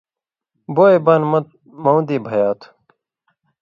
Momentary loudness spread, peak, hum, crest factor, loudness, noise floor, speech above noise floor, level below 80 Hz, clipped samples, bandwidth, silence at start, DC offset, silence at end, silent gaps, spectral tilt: 11 LU; 0 dBFS; none; 18 dB; -16 LUFS; -87 dBFS; 72 dB; -66 dBFS; under 0.1%; 7 kHz; 0.7 s; under 0.1%; 0.95 s; none; -9.5 dB/octave